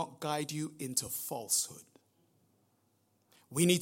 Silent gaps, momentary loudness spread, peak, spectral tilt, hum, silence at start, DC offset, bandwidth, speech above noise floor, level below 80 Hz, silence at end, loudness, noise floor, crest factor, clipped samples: none; 9 LU; -14 dBFS; -3.5 dB/octave; none; 0 s; under 0.1%; 16.5 kHz; 40 dB; -74 dBFS; 0 s; -34 LUFS; -74 dBFS; 24 dB; under 0.1%